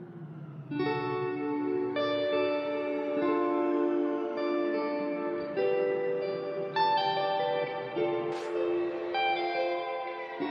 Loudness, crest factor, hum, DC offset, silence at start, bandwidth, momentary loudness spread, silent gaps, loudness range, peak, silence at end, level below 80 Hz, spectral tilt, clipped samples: -31 LUFS; 14 dB; none; under 0.1%; 0 s; 7.2 kHz; 5 LU; none; 1 LU; -16 dBFS; 0 s; -78 dBFS; -7 dB/octave; under 0.1%